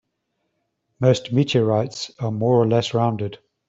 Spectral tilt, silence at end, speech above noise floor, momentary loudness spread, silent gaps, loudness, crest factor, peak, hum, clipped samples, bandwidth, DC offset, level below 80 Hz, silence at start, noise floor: -6.5 dB/octave; 0.35 s; 55 dB; 10 LU; none; -21 LUFS; 18 dB; -4 dBFS; none; under 0.1%; 8 kHz; under 0.1%; -60 dBFS; 1 s; -74 dBFS